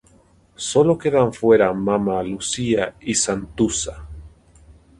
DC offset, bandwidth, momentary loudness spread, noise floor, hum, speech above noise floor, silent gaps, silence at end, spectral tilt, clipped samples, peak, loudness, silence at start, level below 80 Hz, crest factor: under 0.1%; 11.5 kHz; 11 LU; -54 dBFS; none; 35 dB; none; 0.7 s; -4.5 dB/octave; under 0.1%; -4 dBFS; -20 LUFS; 0.6 s; -44 dBFS; 18 dB